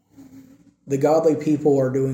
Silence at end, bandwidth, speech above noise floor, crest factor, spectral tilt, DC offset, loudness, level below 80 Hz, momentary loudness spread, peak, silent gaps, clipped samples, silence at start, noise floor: 0 s; 16.5 kHz; 30 dB; 14 dB; -8 dB/octave; under 0.1%; -20 LUFS; -62 dBFS; 4 LU; -6 dBFS; none; under 0.1%; 0.2 s; -49 dBFS